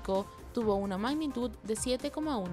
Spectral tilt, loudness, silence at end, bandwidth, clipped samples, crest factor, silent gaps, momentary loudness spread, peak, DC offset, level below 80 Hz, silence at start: -5 dB/octave; -33 LUFS; 0 s; 15.5 kHz; under 0.1%; 14 dB; none; 4 LU; -18 dBFS; under 0.1%; -52 dBFS; 0 s